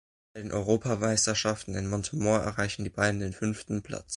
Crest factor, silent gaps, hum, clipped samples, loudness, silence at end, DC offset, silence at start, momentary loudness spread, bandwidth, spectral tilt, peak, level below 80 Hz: 20 dB; none; none; under 0.1%; -29 LUFS; 0 s; under 0.1%; 0.35 s; 10 LU; 11.5 kHz; -4 dB/octave; -10 dBFS; -50 dBFS